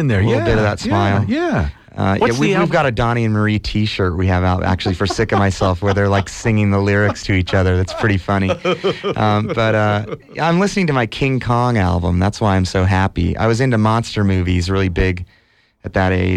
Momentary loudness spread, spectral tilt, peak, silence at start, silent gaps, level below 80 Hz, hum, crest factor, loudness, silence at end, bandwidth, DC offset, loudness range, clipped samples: 4 LU; -6.5 dB/octave; -2 dBFS; 0 s; none; -34 dBFS; none; 14 dB; -16 LUFS; 0 s; 10 kHz; under 0.1%; 1 LU; under 0.1%